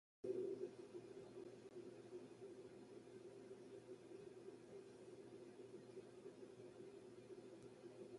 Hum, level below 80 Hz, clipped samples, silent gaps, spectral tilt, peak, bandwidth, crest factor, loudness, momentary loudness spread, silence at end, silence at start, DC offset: none; -90 dBFS; under 0.1%; none; -6.5 dB/octave; -34 dBFS; 11 kHz; 22 dB; -57 LUFS; 10 LU; 0 s; 0.25 s; under 0.1%